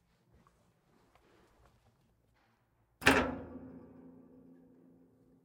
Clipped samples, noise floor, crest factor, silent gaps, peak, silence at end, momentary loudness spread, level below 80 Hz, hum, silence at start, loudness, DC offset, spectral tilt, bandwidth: under 0.1%; -74 dBFS; 32 dB; none; -8 dBFS; 1.65 s; 28 LU; -60 dBFS; none; 3 s; -31 LUFS; under 0.1%; -4 dB/octave; 15.5 kHz